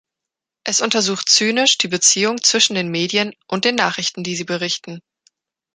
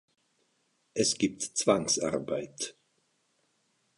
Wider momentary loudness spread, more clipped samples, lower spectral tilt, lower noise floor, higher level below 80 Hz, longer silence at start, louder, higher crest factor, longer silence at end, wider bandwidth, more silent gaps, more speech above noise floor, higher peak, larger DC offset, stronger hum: about the same, 10 LU vs 12 LU; neither; second, -1.5 dB/octave vs -3 dB/octave; first, -85 dBFS vs -74 dBFS; about the same, -66 dBFS vs -68 dBFS; second, 0.65 s vs 0.95 s; first, -16 LUFS vs -30 LUFS; about the same, 20 dB vs 24 dB; second, 0.75 s vs 1.25 s; about the same, 11 kHz vs 11.5 kHz; neither; first, 67 dB vs 44 dB; first, 0 dBFS vs -10 dBFS; neither; neither